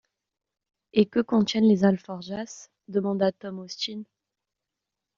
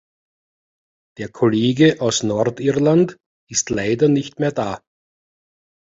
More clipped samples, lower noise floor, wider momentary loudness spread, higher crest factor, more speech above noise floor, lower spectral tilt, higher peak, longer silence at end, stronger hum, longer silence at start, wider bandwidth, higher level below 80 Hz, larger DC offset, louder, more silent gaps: neither; second, -86 dBFS vs under -90 dBFS; first, 17 LU vs 11 LU; about the same, 22 dB vs 18 dB; second, 61 dB vs over 72 dB; about the same, -5.5 dB/octave vs -5 dB/octave; second, -6 dBFS vs -2 dBFS; about the same, 1.15 s vs 1.15 s; neither; second, 0.95 s vs 1.2 s; about the same, 7.4 kHz vs 8 kHz; second, -68 dBFS vs -54 dBFS; neither; second, -25 LUFS vs -18 LUFS; second, none vs 3.26-3.47 s